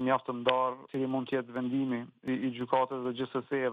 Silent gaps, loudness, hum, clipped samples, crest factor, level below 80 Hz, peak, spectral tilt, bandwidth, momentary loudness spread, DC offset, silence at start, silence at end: none; -32 LUFS; none; under 0.1%; 22 dB; -76 dBFS; -10 dBFS; -8 dB/octave; 4.8 kHz; 6 LU; under 0.1%; 0 s; 0 s